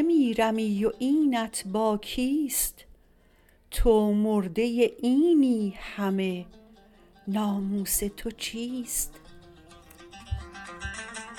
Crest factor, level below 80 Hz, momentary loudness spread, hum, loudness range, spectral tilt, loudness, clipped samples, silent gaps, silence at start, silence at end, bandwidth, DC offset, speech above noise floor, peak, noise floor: 16 dB; -42 dBFS; 15 LU; none; 7 LU; -4.5 dB/octave; -27 LUFS; under 0.1%; none; 0 s; 0 s; 18.5 kHz; under 0.1%; 34 dB; -10 dBFS; -60 dBFS